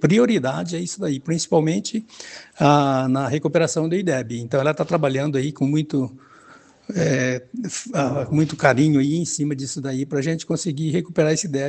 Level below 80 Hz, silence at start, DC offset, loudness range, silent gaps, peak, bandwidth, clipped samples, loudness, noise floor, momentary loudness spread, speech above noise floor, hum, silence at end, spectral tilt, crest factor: -60 dBFS; 0 s; under 0.1%; 3 LU; none; 0 dBFS; 9.2 kHz; under 0.1%; -21 LUFS; -49 dBFS; 9 LU; 28 dB; none; 0 s; -5.5 dB/octave; 20 dB